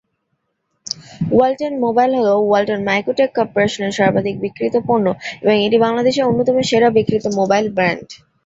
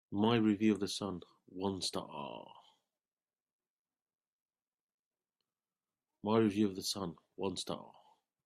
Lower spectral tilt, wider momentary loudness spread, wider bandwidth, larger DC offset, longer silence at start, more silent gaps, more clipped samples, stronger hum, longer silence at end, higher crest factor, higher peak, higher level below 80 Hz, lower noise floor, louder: about the same, -5.5 dB/octave vs -5 dB/octave; second, 7 LU vs 15 LU; second, 8 kHz vs 14.5 kHz; neither; first, 0.95 s vs 0.1 s; second, none vs 3.42-3.46 s, 3.53-3.59 s, 3.70-3.85 s, 4.02-4.06 s, 4.15-4.19 s, 4.28-4.46 s, 4.74-5.11 s; neither; neither; second, 0.3 s vs 0.55 s; second, 14 dB vs 20 dB; first, -2 dBFS vs -18 dBFS; first, -54 dBFS vs -76 dBFS; second, -70 dBFS vs under -90 dBFS; first, -16 LUFS vs -36 LUFS